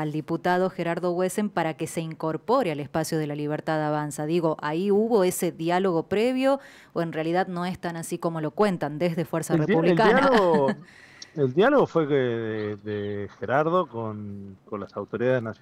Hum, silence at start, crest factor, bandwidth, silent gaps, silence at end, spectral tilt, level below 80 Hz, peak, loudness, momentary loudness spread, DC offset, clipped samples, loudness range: none; 0 s; 16 dB; 16 kHz; none; 0.1 s; -6 dB/octave; -62 dBFS; -8 dBFS; -25 LUFS; 13 LU; under 0.1%; under 0.1%; 5 LU